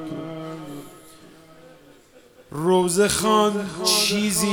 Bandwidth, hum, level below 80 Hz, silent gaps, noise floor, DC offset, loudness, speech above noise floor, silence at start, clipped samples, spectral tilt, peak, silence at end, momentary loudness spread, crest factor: 19 kHz; none; -54 dBFS; none; -51 dBFS; under 0.1%; -20 LUFS; 31 dB; 0 s; under 0.1%; -3.5 dB/octave; -4 dBFS; 0 s; 18 LU; 18 dB